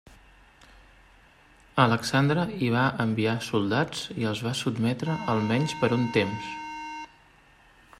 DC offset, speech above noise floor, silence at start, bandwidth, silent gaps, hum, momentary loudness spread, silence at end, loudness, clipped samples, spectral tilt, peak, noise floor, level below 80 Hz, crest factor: under 0.1%; 31 dB; 0.1 s; 13.5 kHz; none; none; 12 LU; 0.95 s; -26 LUFS; under 0.1%; -6 dB/octave; -6 dBFS; -57 dBFS; -58 dBFS; 22 dB